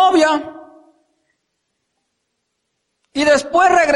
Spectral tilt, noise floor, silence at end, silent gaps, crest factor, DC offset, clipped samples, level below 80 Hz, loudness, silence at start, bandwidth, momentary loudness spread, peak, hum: -2.5 dB/octave; -73 dBFS; 0 s; none; 16 dB; under 0.1%; under 0.1%; -54 dBFS; -15 LUFS; 0 s; 11.5 kHz; 14 LU; -2 dBFS; none